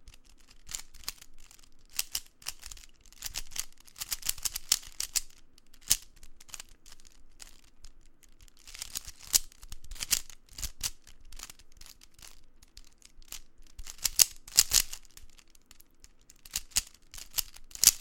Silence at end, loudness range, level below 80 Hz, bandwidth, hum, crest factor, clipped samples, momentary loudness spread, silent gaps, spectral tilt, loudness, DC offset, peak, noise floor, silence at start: 0 s; 12 LU; -50 dBFS; 17 kHz; none; 36 dB; under 0.1%; 28 LU; none; 2 dB/octave; -30 LUFS; under 0.1%; 0 dBFS; -56 dBFS; 0 s